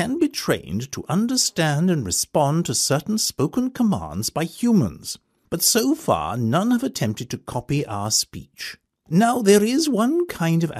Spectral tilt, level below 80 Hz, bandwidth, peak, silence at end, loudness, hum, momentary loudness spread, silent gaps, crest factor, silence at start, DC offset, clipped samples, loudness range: -4.5 dB/octave; -52 dBFS; 15.5 kHz; -4 dBFS; 0 s; -21 LUFS; none; 12 LU; none; 18 dB; 0 s; under 0.1%; under 0.1%; 2 LU